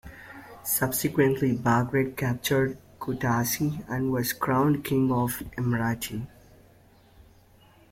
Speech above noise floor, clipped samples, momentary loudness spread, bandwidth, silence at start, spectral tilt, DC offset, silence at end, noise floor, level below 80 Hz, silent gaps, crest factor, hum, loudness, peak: 31 dB; under 0.1%; 13 LU; 16.5 kHz; 0.05 s; -5.5 dB/octave; under 0.1%; 1.65 s; -56 dBFS; -54 dBFS; none; 18 dB; none; -26 LUFS; -10 dBFS